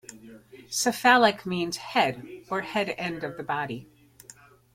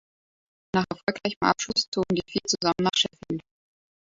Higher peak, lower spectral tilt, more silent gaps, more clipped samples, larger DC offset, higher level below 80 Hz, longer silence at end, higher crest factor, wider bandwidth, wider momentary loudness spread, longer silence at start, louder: about the same, -6 dBFS vs -6 dBFS; about the same, -3 dB/octave vs -3.5 dB/octave; second, none vs 1.03-1.07 s, 1.36-1.41 s, 1.88-1.92 s; neither; neither; second, -66 dBFS vs -60 dBFS; first, 0.9 s vs 0.7 s; about the same, 22 dB vs 22 dB; first, 16.5 kHz vs 7.8 kHz; first, 15 LU vs 7 LU; second, 0.1 s vs 0.75 s; about the same, -26 LUFS vs -26 LUFS